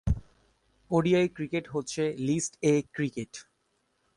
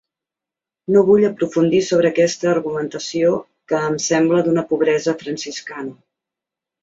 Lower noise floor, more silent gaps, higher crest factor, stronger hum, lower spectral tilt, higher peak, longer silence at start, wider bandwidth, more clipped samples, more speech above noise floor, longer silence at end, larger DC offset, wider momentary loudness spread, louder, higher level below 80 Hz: second, -74 dBFS vs -87 dBFS; neither; about the same, 18 dB vs 16 dB; neither; about the same, -5.5 dB/octave vs -5 dB/octave; second, -12 dBFS vs -2 dBFS; second, 0.05 s vs 0.9 s; first, 11.5 kHz vs 8 kHz; neither; second, 46 dB vs 70 dB; second, 0.75 s vs 0.9 s; neither; second, 10 LU vs 13 LU; second, -29 LUFS vs -18 LUFS; first, -44 dBFS vs -60 dBFS